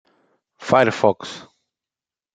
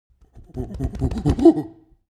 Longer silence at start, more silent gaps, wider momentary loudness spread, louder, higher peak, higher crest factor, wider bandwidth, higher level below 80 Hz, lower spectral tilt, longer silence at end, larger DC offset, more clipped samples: first, 0.6 s vs 0.35 s; neither; about the same, 19 LU vs 21 LU; about the same, -18 LUFS vs -20 LUFS; about the same, -2 dBFS vs -2 dBFS; about the same, 20 dB vs 20 dB; about the same, 9.2 kHz vs 10 kHz; second, -62 dBFS vs -32 dBFS; second, -5.5 dB/octave vs -9 dB/octave; first, 0.95 s vs 0.4 s; neither; neither